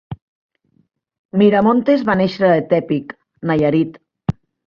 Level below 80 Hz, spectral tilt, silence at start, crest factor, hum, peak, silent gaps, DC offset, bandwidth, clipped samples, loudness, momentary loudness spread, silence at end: -50 dBFS; -9 dB/octave; 0.1 s; 16 dB; none; -2 dBFS; 0.22-0.49 s, 1.19-1.29 s; under 0.1%; 6.6 kHz; under 0.1%; -17 LUFS; 13 LU; 0.35 s